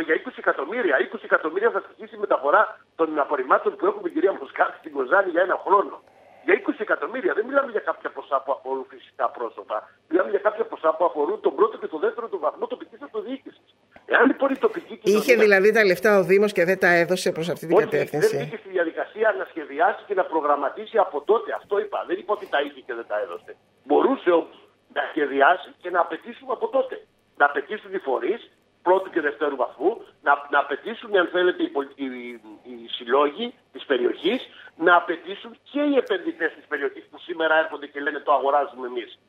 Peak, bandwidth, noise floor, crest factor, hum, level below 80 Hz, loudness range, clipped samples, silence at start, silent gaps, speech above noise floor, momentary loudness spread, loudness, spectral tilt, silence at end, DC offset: -2 dBFS; 16 kHz; -55 dBFS; 22 dB; none; -76 dBFS; 6 LU; under 0.1%; 0 s; none; 32 dB; 14 LU; -23 LUFS; -5 dB/octave; 0.15 s; under 0.1%